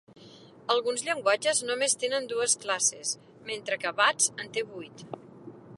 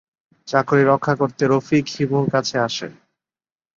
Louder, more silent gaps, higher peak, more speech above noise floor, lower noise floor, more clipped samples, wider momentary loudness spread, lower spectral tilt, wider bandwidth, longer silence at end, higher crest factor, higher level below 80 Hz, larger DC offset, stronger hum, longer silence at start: second, -27 LUFS vs -19 LUFS; neither; second, -8 dBFS vs -2 dBFS; second, 23 dB vs over 71 dB; second, -51 dBFS vs under -90 dBFS; neither; first, 17 LU vs 7 LU; second, -0.5 dB/octave vs -6 dB/octave; first, 11.5 kHz vs 7.6 kHz; second, 0 s vs 0.85 s; about the same, 22 dB vs 18 dB; second, -78 dBFS vs -58 dBFS; neither; neither; second, 0.2 s vs 0.45 s